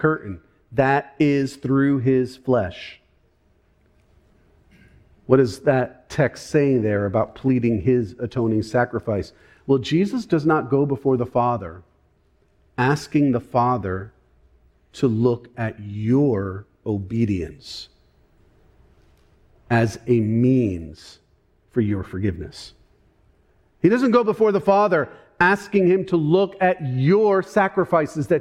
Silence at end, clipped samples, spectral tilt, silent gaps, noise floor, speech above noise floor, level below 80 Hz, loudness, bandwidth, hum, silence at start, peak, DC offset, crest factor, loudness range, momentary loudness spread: 0 s; under 0.1%; -7.5 dB/octave; none; -61 dBFS; 41 dB; -50 dBFS; -21 LUFS; 12.5 kHz; none; 0 s; -2 dBFS; under 0.1%; 18 dB; 7 LU; 14 LU